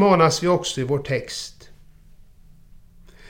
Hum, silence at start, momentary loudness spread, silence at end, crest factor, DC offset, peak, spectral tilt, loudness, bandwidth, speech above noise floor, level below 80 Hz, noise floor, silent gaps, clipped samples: none; 0 s; 15 LU; 1.8 s; 20 dB; under 0.1%; -4 dBFS; -5 dB/octave; -21 LUFS; 16.5 kHz; 28 dB; -50 dBFS; -48 dBFS; none; under 0.1%